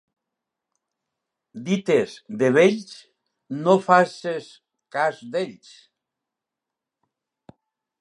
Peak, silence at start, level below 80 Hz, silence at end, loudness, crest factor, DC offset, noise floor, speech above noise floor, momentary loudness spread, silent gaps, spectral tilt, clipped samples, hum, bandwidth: -2 dBFS; 1.55 s; -74 dBFS; 2.45 s; -22 LUFS; 22 dB; under 0.1%; -86 dBFS; 65 dB; 16 LU; none; -6 dB/octave; under 0.1%; none; 11 kHz